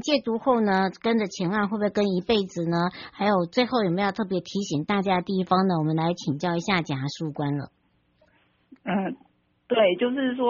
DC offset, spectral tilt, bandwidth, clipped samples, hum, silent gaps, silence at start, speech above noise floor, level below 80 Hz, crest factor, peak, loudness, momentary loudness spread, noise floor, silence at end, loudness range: under 0.1%; -5 dB/octave; 7.2 kHz; under 0.1%; none; none; 0 s; 40 dB; -60 dBFS; 18 dB; -8 dBFS; -25 LUFS; 8 LU; -65 dBFS; 0 s; 5 LU